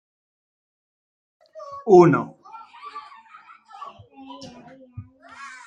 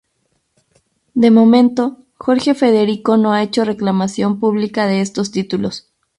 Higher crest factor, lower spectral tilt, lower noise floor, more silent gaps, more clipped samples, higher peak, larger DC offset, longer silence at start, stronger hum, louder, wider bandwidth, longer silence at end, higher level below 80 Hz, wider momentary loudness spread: first, 22 dB vs 14 dB; first, -8 dB/octave vs -6 dB/octave; second, -49 dBFS vs -66 dBFS; neither; neither; about the same, -2 dBFS vs 0 dBFS; neither; first, 1.6 s vs 1.15 s; neither; about the same, -16 LUFS vs -15 LUFS; second, 7.6 kHz vs 11 kHz; second, 0.2 s vs 0.4 s; second, -66 dBFS vs -56 dBFS; first, 29 LU vs 11 LU